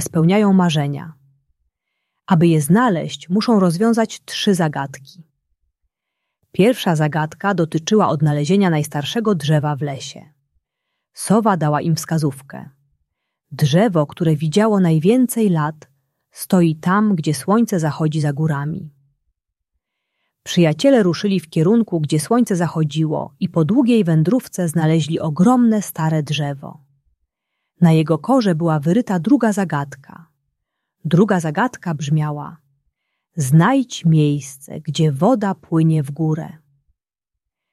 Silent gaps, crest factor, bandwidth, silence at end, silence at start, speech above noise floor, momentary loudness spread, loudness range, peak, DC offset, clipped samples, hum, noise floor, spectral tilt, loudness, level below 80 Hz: none; 16 dB; 13 kHz; 1.2 s; 0 s; 67 dB; 11 LU; 4 LU; -2 dBFS; under 0.1%; under 0.1%; none; -84 dBFS; -6.5 dB/octave; -17 LUFS; -60 dBFS